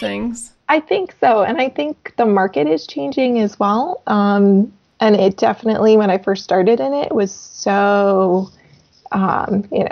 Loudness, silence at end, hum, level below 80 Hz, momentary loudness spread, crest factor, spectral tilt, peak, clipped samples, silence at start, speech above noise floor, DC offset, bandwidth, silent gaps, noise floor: -16 LUFS; 0 s; none; -56 dBFS; 10 LU; 14 dB; -6 dB/octave; -2 dBFS; under 0.1%; 0 s; 30 dB; under 0.1%; 9.2 kHz; none; -45 dBFS